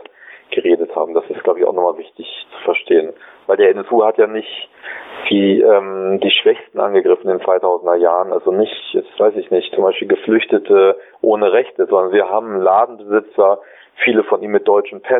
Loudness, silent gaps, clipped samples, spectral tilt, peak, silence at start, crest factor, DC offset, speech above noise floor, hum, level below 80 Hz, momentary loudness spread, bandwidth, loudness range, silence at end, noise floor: -15 LUFS; none; under 0.1%; -8.5 dB/octave; -2 dBFS; 0.35 s; 14 dB; under 0.1%; 26 dB; none; -68 dBFS; 10 LU; 4 kHz; 3 LU; 0 s; -40 dBFS